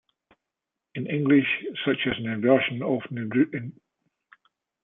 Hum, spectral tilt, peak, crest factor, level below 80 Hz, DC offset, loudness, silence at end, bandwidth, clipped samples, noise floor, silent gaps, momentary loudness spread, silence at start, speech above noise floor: none; -10 dB/octave; -8 dBFS; 20 dB; -66 dBFS; under 0.1%; -25 LUFS; 1.15 s; 3.9 kHz; under 0.1%; -86 dBFS; none; 14 LU; 0.95 s; 62 dB